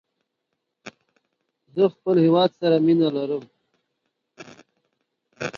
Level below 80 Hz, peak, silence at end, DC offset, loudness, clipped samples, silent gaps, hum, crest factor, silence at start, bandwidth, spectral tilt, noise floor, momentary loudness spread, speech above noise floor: -72 dBFS; -6 dBFS; 0 s; under 0.1%; -21 LUFS; under 0.1%; none; none; 18 dB; 0.85 s; 7.2 kHz; -7.5 dB/octave; -79 dBFS; 13 LU; 60 dB